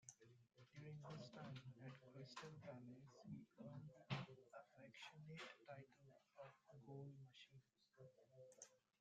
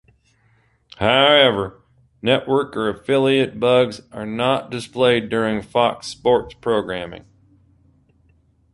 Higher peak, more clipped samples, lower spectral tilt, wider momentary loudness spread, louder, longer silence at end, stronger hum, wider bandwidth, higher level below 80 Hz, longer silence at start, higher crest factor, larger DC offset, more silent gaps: second, -34 dBFS vs -2 dBFS; neither; about the same, -5 dB/octave vs -5 dB/octave; second, 10 LU vs 14 LU; second, -60 LUFS vs -19 LUFS; second, 0.2 s vs 1.55 s; neither; second, 8.8 kHz vs 11.5 kHz; second, -90 dBFS vs -52 dBFS; second, 0 s vs 1 s; first, 26 dB vs 20 dB; neither; neither